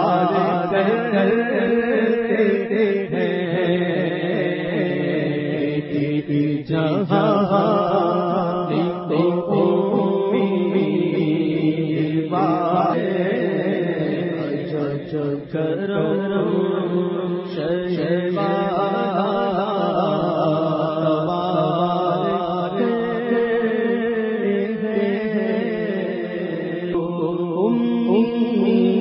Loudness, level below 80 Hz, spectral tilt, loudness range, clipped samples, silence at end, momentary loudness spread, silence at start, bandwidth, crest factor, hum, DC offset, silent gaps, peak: -20 LUFS; -58 dBFS; -11.5 dB/octave; 3 LU; under 0.1%; 0 s; 5 LU; 0 s; 5.8 kHz; 16 dB; none; under 0.1%; none; -4 dBFS